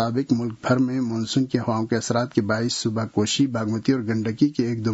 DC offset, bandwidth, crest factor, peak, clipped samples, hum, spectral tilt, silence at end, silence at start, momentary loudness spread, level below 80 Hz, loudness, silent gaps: under 0.1%; 8 kHz; 16 dB; -6 dBFS; under 0.1%; none; -5.5 dB/octave; 0 s; 0 s; 3 LU; -60 dBFS; -23 LUFS; none